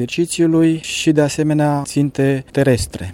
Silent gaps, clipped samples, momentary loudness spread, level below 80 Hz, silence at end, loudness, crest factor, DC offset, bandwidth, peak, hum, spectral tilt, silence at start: none; under 0.1%; 4 LU; -40 dBFS; 0 s; -16 LUFS; 14 dB; under 0.1%; 16 kHz; -2 dBFS; none; -5.5 dB/octave; 0 s